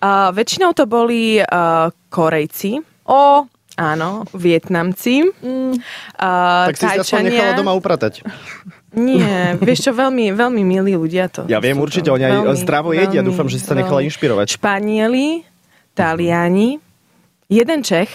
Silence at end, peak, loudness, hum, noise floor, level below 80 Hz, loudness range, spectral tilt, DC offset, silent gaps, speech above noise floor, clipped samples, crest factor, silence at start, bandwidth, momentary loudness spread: 0 s; -2 dBFS; -15 LUFS; none; -56 dBFS; -56 dBFS; 2 LU; -5.5 dB/octave; under 0.1%; none; 42 dB; under 0.1%; 14 dB; 0 s; 16 kHz; 8 LU